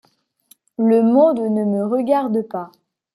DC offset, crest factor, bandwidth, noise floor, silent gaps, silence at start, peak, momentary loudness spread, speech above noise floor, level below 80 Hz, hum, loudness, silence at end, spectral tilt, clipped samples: under 0.1%; 14 dB; 12.5 kHz; -56 dBFS; none; 0.8 s; -4 dBFS; 16 LU; 39 dB; -70 dBFS; none; -17 LUFS; 0.5 s; -9 dB/octave; under 0.1%